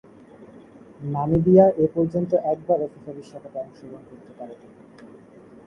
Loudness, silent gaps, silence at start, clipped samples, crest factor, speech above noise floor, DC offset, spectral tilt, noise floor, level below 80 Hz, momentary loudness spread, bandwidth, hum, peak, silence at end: -20 LUFS; none; 0.4 s; under 0.1%; 22 dB; 25 dB; under 0.1%; -11 dB/octave; -47 dBFS; -52 dBFS; 25 LU; 6.4 kHz; none; -2 dBFS; 0.6 s